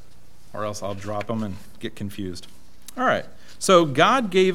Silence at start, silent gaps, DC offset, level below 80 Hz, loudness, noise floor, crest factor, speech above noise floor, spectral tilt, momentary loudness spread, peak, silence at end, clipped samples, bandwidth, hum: 0.55 s; none; 2%; -56 dBFS; -22 LUFS; -52 dBFS; 22 dB; 30 dB; -4.5 dB/octave; 18 LU; -2 dBFS; 0 s; under 0.1%; 16.5 kHz; none